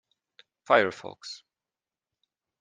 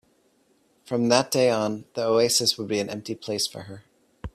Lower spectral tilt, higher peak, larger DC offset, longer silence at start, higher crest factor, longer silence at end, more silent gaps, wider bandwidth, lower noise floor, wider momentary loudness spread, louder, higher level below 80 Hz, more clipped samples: about the same, -4 dB/octave vs -3.5 dB/octave; second, -6 dBFS vs -2 dBFS; neither; second, 0.7 s vs 0.85 s; about the same, 26 dB vs 22 dB; first, 1.25 s vs 0.05 s; neither; second, 9.6 kHz vs 15.5 kHz; first, under -90 dBFS vs -64 dBFS; first, 19 LU vs 13 LU; about the same, -24 LUFS vs -24 LUFS; second, -82 dBFS vs -54 dBFS; neither